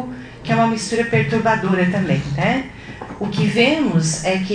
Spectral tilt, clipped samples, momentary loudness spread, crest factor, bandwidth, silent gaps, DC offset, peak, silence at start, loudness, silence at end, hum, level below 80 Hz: -5.5 dB/octave; under 0.1%; 15 LU; 16 dB; 10 kHz; none; under 0.1%; -2 dBFS; 0 s; -18 LUFS; 0 s; none; -44 dBFS